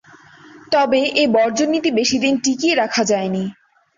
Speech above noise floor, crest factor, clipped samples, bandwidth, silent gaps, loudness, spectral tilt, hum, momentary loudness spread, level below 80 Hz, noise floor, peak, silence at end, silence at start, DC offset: 28 dB; 16 dB; under 0.1%; 7.8 kHz; none; -17 LUFS; -3.5 dB/octave; none; 5 LU; -58 dBFS; -45 dBFS; -4 dBFS; 0.45 s; 0.55 s; under 0.1%